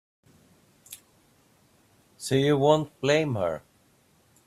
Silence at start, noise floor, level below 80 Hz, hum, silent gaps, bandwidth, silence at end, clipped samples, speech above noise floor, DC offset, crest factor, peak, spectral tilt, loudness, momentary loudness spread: 0.9 s; -63 dBFS; -66 dBFS; none; none; 14.5 kHz; 0.9 s; under 0.1%; 39 dB; under 0.1%; 22 dB; -6 dBFS; -5.5 dB/octave; -25 LUFS; 24 LU